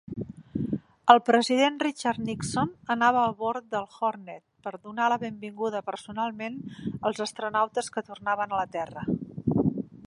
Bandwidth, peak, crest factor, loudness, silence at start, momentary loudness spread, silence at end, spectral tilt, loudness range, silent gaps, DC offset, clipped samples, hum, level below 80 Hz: 11.5 kHz; -2 dBFS; 26 dB; -27 LUFS; 0.1 s; 14 LU; 0 s; -5 dB/octave; 7 LU; none; under 0.1%; under 0.1%; none; -58 dBFS